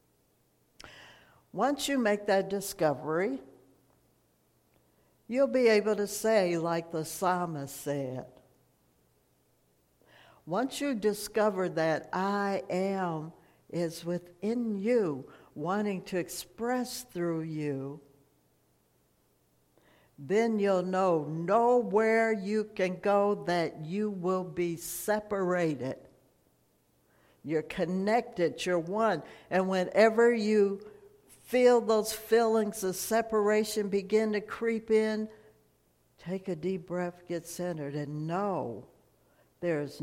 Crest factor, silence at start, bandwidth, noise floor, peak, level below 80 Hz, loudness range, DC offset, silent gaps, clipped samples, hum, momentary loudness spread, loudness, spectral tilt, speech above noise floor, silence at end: 20 dB; 0.85 s; 16.5 kHz; -70 dBFS; -12 dBFS; -70 dBFS; 9 LU; under 0.1%; none; under 0.1%; none; 12 LU; -30 LUFS; -5 dB/octave; 41 dB; 0 s